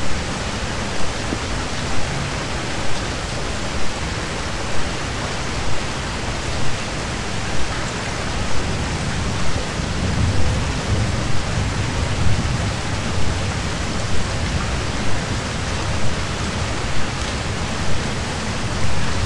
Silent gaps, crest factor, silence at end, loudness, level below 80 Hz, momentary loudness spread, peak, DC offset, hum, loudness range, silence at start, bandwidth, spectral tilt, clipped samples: none; 16 dB; 0 s; -23 LUFS; -30 dBFS; 3 LU; -4 dBFS; 4%; none; 3 LU; 0 s; 11.5 kHz; -4.5 dB/octave; under 0.1%